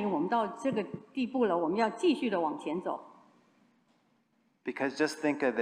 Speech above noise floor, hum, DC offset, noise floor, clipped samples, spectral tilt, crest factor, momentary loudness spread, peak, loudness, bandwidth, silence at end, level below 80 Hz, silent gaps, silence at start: 41 dB; none; under 0.1%; -72 dBFS; under 0.1%; -5.5 dB/octave; 18 dB; 10 LU; -14 dBFS; -32 LUFS; 14.5 kHz; 0 s; -78 dBFS; none; 0 s